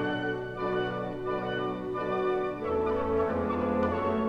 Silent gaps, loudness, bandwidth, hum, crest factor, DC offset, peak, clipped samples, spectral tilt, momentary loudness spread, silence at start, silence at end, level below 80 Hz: none; -30 LUFS; 8 kHz; none; 14 dB; 0.1%; -16 dBFS; under 0.1%; -8 dB/octave; 5 LU; 0 s; 0 s; -50 dBFS